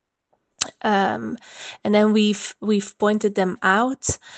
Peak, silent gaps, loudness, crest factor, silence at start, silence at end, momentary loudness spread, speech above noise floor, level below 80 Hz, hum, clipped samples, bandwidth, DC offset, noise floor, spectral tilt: -2 dBFS; none; -21 LUFS; 20 dB; 0.6 s; 0 s; 11 LU; 49 dB; -54 dBFS; none; under 0.1%; 9 kHz; under 0.1%; -70 dBFS; -4 dB/octave